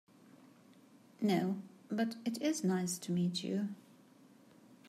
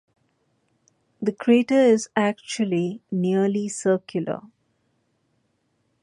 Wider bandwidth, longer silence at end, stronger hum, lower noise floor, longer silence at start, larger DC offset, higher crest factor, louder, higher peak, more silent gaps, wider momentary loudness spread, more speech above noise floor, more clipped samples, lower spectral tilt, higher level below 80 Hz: first, 15.5 kHz vs 11.5 kHz; second, 0 s vs 1.55 s; neither; second, -62 dBFS vs -70 dBFS; second, 0.4 s vs 1.2 s; neither; about the same, 16 dB vs 18 dB; second, -36 LUFS vs -22 LUFS; second, -22 dBFS vs -6 dBFS; neither; about the same, 9 LU vs 11 LU; second, 27 dB vs 49 dB; neither; about the same, -5.5 dB/octave vs -5.5 dB/octave; second, -84 dBFS vs -72 dBFS